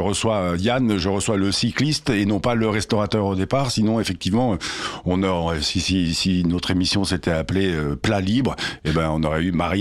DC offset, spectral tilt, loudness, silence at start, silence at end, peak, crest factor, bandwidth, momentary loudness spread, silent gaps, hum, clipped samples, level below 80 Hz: 0.2%; -5 dB/octave; -21 LUFS; 0 s; 0 s; -8 dBFS; 14 dB; 14 kHz; 3 LU; none; none; under 0.1%; -42 dBFS